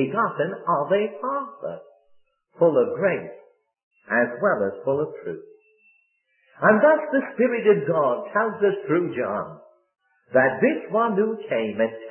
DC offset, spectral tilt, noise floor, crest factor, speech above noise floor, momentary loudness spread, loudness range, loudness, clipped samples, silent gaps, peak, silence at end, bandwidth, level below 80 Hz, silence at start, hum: under 0.1%; -11 dB/octave; -67 dBFS; 20 dB; 45 dB; 12 LU; 5 LU; -22 LUFS; under 0.1%; 3.83-3.91 s; -4 dBFS; 0 s; 3.3 kHz; -72 dBFS; 0 s; none